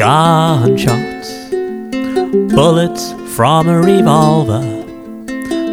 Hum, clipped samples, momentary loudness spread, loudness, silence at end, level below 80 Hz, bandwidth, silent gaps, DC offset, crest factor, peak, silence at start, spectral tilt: none; under 0.1%; 14 LU; -12 LUFS; 0 s; -42 dBFS; 16.5 kHz; none; 0.2%; 12 dB; 0 dBFS; 0 s; -6 dB/octave